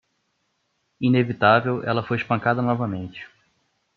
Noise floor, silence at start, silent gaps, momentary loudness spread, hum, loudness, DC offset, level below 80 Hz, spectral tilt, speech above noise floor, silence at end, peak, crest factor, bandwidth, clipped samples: -72 dBFS; 1 s; none; 13 LU; none; -22 LUFS; under 0.1%; -64 dBFS; -9 dB/octave; 51 dB; 0.7 s; -4 dBFS; 20 dB; 6 kHz; under 0.1%